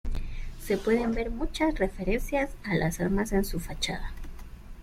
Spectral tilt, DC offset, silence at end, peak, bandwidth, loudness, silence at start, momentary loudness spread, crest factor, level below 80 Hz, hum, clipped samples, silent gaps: -5.5 dB/octave; under 0.1%; 0 s; -12 dBFS; 16 kHz; -29 LUFS; 0.05 s; 16 LU; 16 dB; -36 dBFS; none; under 0.1%; none